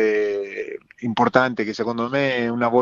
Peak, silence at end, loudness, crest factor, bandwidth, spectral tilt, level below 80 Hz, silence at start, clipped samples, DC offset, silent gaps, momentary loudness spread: 0 dBFS; 0 s; -22 LUFS; 20 dB; 7.4 kHz; -6 dB/octave; -62 dBFS; 0 s; under 0.1%; under 0.1%; none; 12 LU